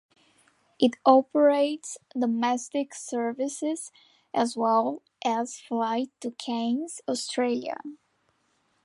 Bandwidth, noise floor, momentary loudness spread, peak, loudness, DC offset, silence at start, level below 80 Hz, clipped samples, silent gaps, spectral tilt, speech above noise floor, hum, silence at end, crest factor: 11.5 kHz; -71 dBFS; 14 LU; -6 dBFS; -27 LUFS; under 0.1%; 0.8 s; -82 dBFS; under 0.1%; none; -3.5 dB/octave; 44 dB; none; 0.9 s; 22 dB